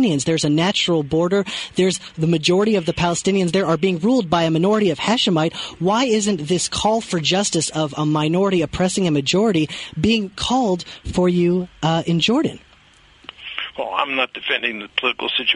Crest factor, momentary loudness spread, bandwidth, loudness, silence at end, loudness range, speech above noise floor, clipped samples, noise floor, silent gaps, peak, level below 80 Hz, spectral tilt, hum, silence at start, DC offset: 16 dB; 5 LU; 11 kHz; -19 LUFS; 0 s; 3 LU; 32 dB; under 0.1%; -51 dBFS; none; -2 dBFS; -46 dBFS; -4.5 dB/octave; none; 0 s; under 0.1%